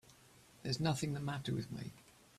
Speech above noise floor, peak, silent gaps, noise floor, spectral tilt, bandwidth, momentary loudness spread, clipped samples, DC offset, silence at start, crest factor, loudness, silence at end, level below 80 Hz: 25 dB; -22 dBFS; none; -64 dBFS; -5.5 dB/octave; 14.5 kHz; 12 LU; under 0.1%; under 0.1%; 0.1 s; 20 dB; -40 LUFS; 0.35 s; -66 dBFS